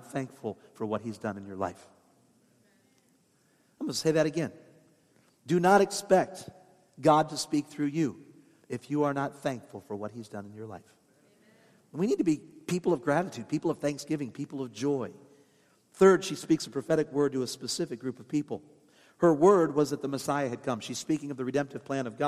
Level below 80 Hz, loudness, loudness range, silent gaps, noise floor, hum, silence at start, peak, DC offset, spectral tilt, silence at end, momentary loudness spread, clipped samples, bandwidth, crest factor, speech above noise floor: -74 dBFS; -29 LUFS; 8 LU; none; -67 dBFS; none; 0.05 s; -8 dBFS; under 0.1%; -5.5 dB/octave; 0 s; 17 LU; under 0.1%; 15 kHz; 22 dB; 39 dB